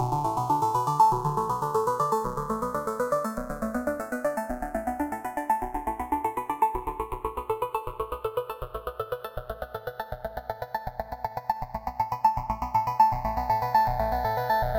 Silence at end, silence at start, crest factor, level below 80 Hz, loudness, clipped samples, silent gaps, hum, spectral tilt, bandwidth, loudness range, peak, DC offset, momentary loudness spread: 0 s; 0 s; 20 dB; -44 dBFS; -28 LUFS; under 0.1%; none; none; -6 dB/octave; 17 kHz; 9 LU; -8 dBFS; under 0.1%; 13 LU